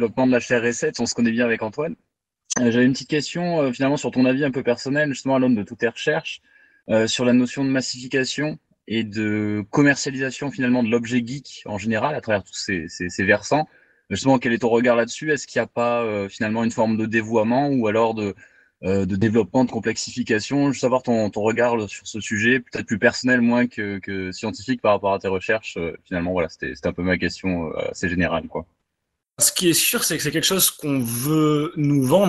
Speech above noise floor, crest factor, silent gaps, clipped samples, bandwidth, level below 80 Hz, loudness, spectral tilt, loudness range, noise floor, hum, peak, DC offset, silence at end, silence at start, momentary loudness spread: 58 dB; 18 dB; none; under 0.1%; 13 kHz; -54 dBFS; -21 LUFS; -4.5 dB/octave; 3 LU; -79 dBFS; none; -2 dBFS; under 0.1%; 0 s; 0 s; 10 LU